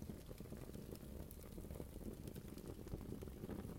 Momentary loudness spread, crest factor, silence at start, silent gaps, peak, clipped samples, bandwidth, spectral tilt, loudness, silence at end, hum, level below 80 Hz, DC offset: 4 LU; 18 dB; 0 s; none; -34 dBFS; under 0.1%; 16.5 kHz; -6.5 dB/octave; -53 LUFS; 0 s; none; -58 dBFS; under 0.1%